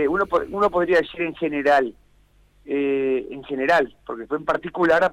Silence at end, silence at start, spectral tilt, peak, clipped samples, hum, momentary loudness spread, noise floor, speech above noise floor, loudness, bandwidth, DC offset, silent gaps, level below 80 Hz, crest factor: 0 s; 0 s; -6 dB/octave; -8 dBFS; under 0.1%; 50 Hz at -60 dBFS; 10 LU; -57 dBFS; 36 dB; -22 LUFS; 12 kHz; under 0.1%; none; -52 dBFS; 14 dB